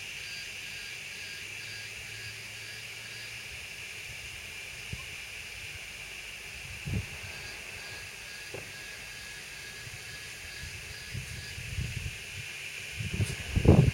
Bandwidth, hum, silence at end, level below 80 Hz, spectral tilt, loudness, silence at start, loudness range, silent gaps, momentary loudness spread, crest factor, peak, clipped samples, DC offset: 16.5 kHz; none; 0 s; -46 dBFS; -5 dB/octave; -36 LUFS; 0 s; 3 LU; none; 6 LU; 28 dB; -6 dBFS; under 0.1%; under 0.1%